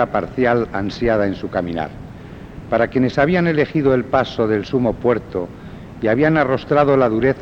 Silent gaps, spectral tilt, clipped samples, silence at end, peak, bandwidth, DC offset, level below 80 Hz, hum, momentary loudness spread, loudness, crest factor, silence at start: none; -8 dB/octave; under 0.1%; 0 s; -2 dBFS; 7.8 kHz; under 0.1%; -42 dBFS; none; 16 LU; -18 LUFS; 16 dB; 0 s